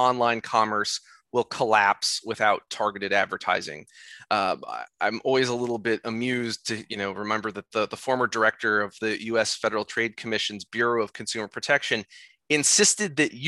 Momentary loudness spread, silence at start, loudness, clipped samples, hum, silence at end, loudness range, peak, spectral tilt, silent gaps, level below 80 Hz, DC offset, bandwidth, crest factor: 10 LU; 0 s; -25 LUFS; under 0.1%; none; 0 s; 3 LU; -6 dBFS; -2 dB/octave; none; -68 dBFS; under 0.1%; 13 kHz; 20 dB